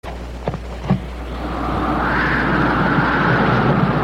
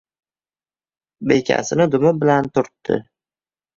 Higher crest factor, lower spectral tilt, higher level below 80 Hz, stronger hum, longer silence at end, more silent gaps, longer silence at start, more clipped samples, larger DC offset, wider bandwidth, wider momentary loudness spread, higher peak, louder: about the same, 14 dB vs 18 dB; first, -7.5 dB/octave vs -6 dB/octave; first, -30 dBFS vs -58 dBFS; neither; second, 0 s vs 0.75 s; neither; second, 0.05 s vs 1.2 s; neither; neither; first, 12.5 kHz vs 7.6 kHz; first, 12 LU vs 8 LU; about the same, -4 dBFS vs -2 dBFS; about the same, -18 LUFS vs -18 LUFS